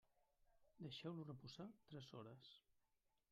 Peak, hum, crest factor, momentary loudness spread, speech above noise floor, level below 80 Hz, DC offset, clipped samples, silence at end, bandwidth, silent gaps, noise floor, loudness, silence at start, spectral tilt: -38 dBFS; none; 20 dB; 9 LU; 30 dB; -86 dBFS; under 0.1%; under 0.1%; 0.55 s; 13 kHz; none; -87 dBFS; -57 LUFS; 0.2 s; -6.5 dB/octave